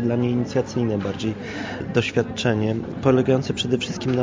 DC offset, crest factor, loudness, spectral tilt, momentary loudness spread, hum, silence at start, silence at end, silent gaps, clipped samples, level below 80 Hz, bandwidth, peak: under 0.1%; 18 dB; -23 LUFS; -6 dB/octave; 8 LU; none; 0 s; 0 s; none; under 0.1%; -48 dBFS; 7.6 kHz; -4 dBFS